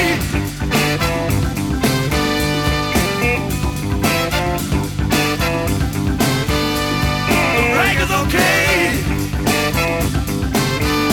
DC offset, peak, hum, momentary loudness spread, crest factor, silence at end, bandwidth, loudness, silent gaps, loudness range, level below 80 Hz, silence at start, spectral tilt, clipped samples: under 0.1%; -2 dBFS; none; 6 LU; 16 dB; 0 s; 20 kHz; -17 LUFS; none; 3 LU; -26 dBFS; 0 s; -4.5 dB/octave; under 0.1%